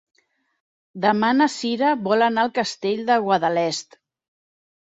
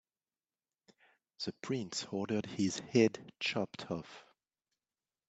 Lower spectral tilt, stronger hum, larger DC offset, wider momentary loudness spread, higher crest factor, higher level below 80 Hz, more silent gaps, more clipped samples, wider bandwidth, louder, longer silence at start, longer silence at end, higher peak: about the same, -4.5 dB/octave vs -4.5 dB/octave; neither; neither; second, 6 LU vs 13 LU; about the same, 18 dB vs 22 dB; first, -70 dBFS vs -78 dBFS; neither; neither; about the same, 8.2 kHz vs 8.8 kHz; first, -21 LUFS vs -36 LUFS; second, 0.95 s vs 1.4 s; about the same, 1 s vs 1.1 s; first, -4 dBFS vs -16 dBFS